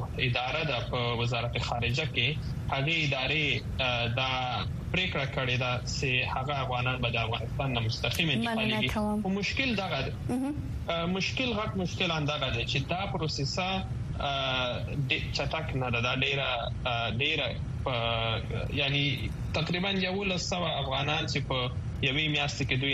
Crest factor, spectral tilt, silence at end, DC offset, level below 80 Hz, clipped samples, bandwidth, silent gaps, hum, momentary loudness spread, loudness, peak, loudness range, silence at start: 18 dB; -5 dB/octave; 0 s; under 0.1%; -44 dBFS; under 0.1%; 14 kHz; none; none; 5 LU; -29 LUFS; -12 dBFS; 2 LU; 0 s